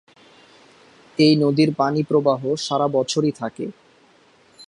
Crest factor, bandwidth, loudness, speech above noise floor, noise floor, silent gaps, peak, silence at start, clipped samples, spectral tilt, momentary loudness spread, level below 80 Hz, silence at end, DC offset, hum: 18 dB; 11 kHz; -19 LUFS; 36 dB; -55 dBFS; none; -4 dBFS; 1.2 s; under 0.1%; -6 dB/octave; 14 LU; -66 dBFS; 0.05 s; under 0.1%; none